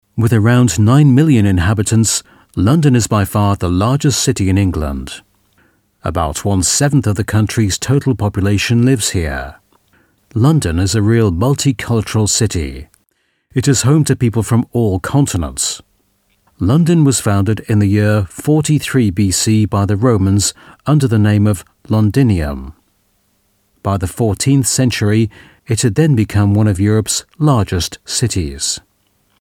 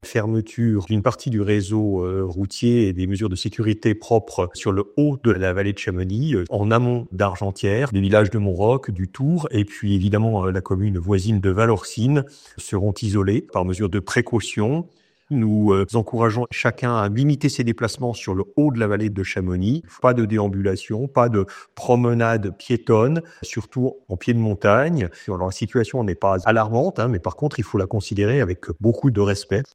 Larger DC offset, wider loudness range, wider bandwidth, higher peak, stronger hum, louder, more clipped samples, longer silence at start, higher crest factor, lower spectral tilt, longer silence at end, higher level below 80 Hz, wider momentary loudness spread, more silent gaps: neither; about the same, 3 LU vs 1 LU; first, 16.5 kHz vs 11 kHz; about the same, 0 dBFS vs -2 dBFS; neither; first, -14 LUFS vs -21 LUFS; neither; about the same, 0.15 s vs 0.05 s; about the same, 14 dB vs 18 dB; second, -5.5 dB/octave vs -7 dB/octave; first, 0.6 s vs 0.1 s; first, -34 dBFS vs -52 dBFS; about the same, 9 LU vs 7 LU; neither